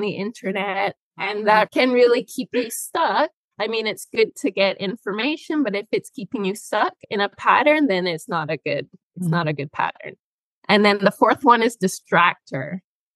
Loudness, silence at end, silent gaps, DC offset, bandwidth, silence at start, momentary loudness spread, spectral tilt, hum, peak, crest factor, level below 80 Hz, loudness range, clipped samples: -21 LUFS; 0.35 s; 0.97-1.11 s, 3.33-3.51 s, 9.03-9.10 s, 10.19-10.62 s; under 0.1%; 12.5 kHz; 0 s; 12 LU; -4.5 dB/octave; none; -2 dBFS; 20 dB; -72 dBFS; 4 LU; under 0.1%